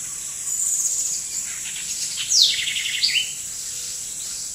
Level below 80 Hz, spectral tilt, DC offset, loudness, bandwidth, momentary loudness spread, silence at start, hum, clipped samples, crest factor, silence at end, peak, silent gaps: -58 dBFS; 3 dB/octave; under 0.1%; -21 LUFS; 16 kHz; 12 LU; 0 s; none; under 0.1%; 24 dB; 0 s; 0 dBFS; none